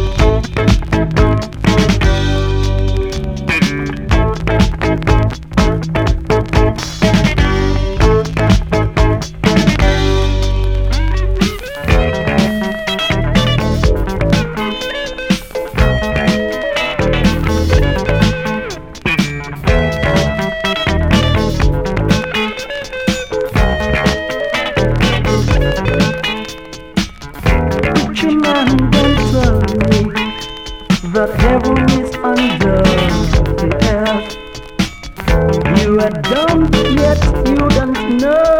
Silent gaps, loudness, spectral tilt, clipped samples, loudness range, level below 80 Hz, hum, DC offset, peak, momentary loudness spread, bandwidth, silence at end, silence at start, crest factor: none; -14 LUFS; -6 dB/octave; under 0.1%; 2 LU; -20 dBFS; none; 0.8%; 0 dBFS; 7 LU; 16.5 kHz; 0 s; 0 s; 14 dB